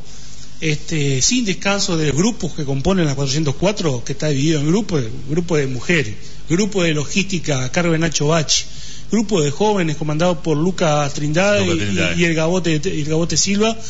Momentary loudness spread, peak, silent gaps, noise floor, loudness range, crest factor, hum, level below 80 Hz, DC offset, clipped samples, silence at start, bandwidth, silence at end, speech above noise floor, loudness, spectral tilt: 7 LU; -4 dBFS; none; -38 dBFS; 2 LU; 14 dB; none; -40 dBFS; 6%; under 0.1%; 0 s; 8 kHz; 0 s; 20 dB; -18 LUFS; -4.5 dB/octave